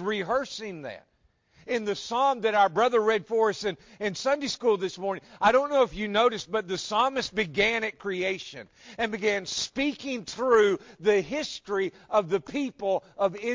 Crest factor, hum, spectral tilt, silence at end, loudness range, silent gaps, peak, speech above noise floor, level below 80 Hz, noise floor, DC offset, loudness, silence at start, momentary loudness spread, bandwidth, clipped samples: 18 dB; none; -3.5 dB/octave; 0 s; 2 LU; none; -8 dBFS; 36 dB; -60 dBFS; -63 dBFS; under 0.1%; -27 LUFS; 0 s; 11 LU; 7.6 kHz; under 0.1%